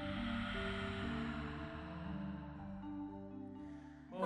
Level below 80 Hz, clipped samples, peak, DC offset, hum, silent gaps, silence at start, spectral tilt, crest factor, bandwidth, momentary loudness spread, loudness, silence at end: -54 dBFS; under 0.1%; -26 dBFS; under 0.1%; none; none; 0 s; -7 dB/octave; 18 dB; 10 kHz; 10 LU; -45 LUFS; 0 s